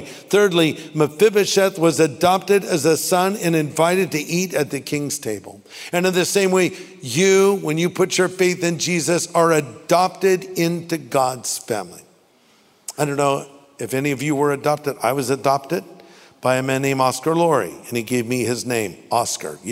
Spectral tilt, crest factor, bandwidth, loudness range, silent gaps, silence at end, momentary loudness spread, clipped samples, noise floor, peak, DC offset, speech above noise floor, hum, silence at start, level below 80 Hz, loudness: -4.5 dB/octave; 18 dB; 16 kHz; 6 LU; none; 0 s; 9 LU; under 0.1%; -55 dBFS; -2 dBFS; under 0.1%; 36 dB; none; 0 s; -64 dBFS; -19 LUFS